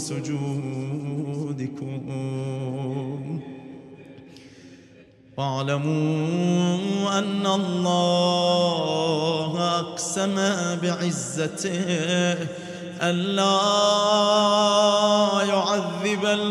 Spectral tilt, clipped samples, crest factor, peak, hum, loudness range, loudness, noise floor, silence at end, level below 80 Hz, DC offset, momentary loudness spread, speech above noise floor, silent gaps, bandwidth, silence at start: -4.5 dB/octave; under 0.1%; 16 dB; -6 dBFS; none; 12 LU; -23 LUFS; -51 dBFS; 0 s; -70 dBFS; under 0.1%; 12 LU; 28 dB; none; 13 kHz; 0 s